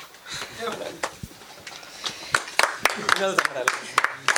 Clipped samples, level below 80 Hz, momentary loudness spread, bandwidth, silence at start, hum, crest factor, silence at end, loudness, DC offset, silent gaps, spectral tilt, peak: under 0.1%; -60 dBFS; 18 LU; over 20 kHz; 0 s; none; 24 dB; 0 s; -25 LUFS; under 0.1%; none; -1 dB/octave; -2 dBFS